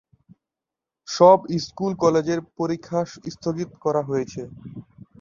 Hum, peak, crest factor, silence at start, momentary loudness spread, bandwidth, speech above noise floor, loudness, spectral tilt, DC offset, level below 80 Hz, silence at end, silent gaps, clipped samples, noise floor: none; -2 dBFS; 22 dB; 1.1 s; 21 LU; 7.4 kHz; 66 dB; -22 LUFS; -6 dB/octave; under 0.1%; -60 dBFS; 0.4 s; none; under 0.1%; -88 dBFS